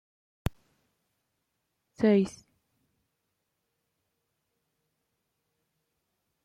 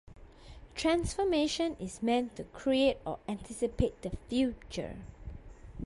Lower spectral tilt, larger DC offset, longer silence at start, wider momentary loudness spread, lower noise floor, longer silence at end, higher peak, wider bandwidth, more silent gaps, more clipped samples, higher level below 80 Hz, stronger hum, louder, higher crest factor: first, -7.5 dB/octave vs -5 dB/octave; neither; first, 0.45 s vs 0.1 s; second, 14 LU vs 18 LU; first, -81 dBFS vs -52 dBFS; first, 4.15 s vs 0 s; first, -12 dBFS vs -16 dBFS; first, 14 kHz vs 11.5 kHz; neither; neither; second, -54 dBFS vs -48 dBFS; neither; first, -29 LUFS vs -32 LUFS; about the same, 22 dB vs 18 dB